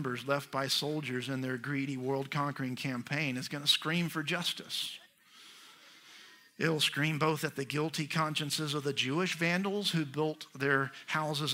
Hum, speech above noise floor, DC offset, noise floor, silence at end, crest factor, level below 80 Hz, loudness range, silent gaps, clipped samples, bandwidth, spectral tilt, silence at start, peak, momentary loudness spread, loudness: none; 24 dB; under 0.1%; -58 dBFS; 0 s; 20 dB; -78 dBFS; 3 LU; none; under 0.1%; 16 kHz; -4 dB/octave; 0 s; -14 dBFS; 7 LU; -33 LUFS